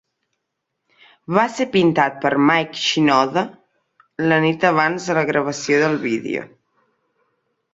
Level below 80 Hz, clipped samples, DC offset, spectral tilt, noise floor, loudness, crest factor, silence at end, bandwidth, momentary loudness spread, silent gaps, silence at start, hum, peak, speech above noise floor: -62 dBFS; under 0.1%; under 0.1%; -5 dB/octave; -77 dBFS; -18 LUFS; 18 dB; 1.3 s; 8 kHz; 8 LU; none; 1.3 s; none; -2 dBFS; 60 dB